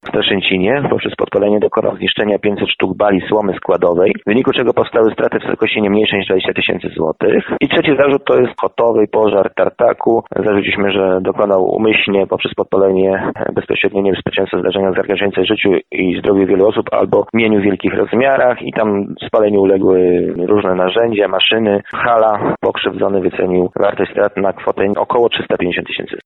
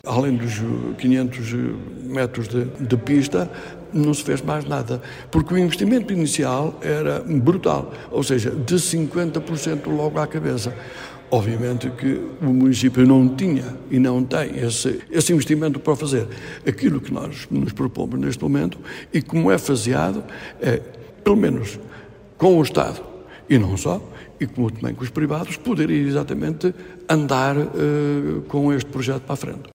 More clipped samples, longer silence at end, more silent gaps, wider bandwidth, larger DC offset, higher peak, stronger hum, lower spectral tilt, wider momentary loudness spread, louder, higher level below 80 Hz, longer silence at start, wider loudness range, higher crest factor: neither; about the same, 0.05 s vs 0.05 s; neither; second, 4.1 kHz vs 16 kHz; neither; about the same, -2 dBFS vs -2 dBFS; neither; first, -8.5 dB/octave vs -6 dB/octave; second, 5 LU vs 10 LU; first, -14 LUFS vs -21 LUFS; about the same, -48 dBFS vs -46 dBFS; about the same, 0.05 s vs 0.05 s; about the same, 2 LU vs 4 LU; second, 12 dB vs 18 dB